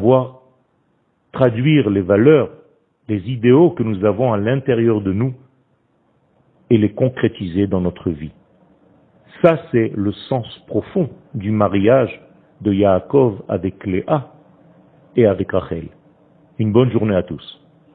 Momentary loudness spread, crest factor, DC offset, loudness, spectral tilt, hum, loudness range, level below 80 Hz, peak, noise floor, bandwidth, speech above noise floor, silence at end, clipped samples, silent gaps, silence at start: 13 LU; 18 dB; under 0.1%; -17 LUFS; -11 dB/octave; none; 5 LU; -50 dBFS; 0 dBFS; -62 dBFS; 4.4 kHz; 46 dB; 0.45 s; under 0.1%; none; 0 s